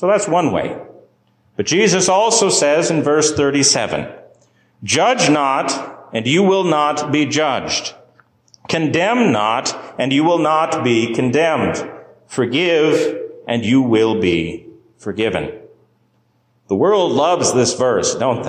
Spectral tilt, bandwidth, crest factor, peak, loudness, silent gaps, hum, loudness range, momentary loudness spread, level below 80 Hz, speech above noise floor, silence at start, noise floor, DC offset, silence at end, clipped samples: -4 dB/octave; 13.5 kHz; 14 dB; -2 dBFS; -16 LUFS; none; none; 4 LU; 12 LU; -50 dBFS; 45 dB; 0 s; -60 dBFS; under 0.1%; 0 s; under 0.1%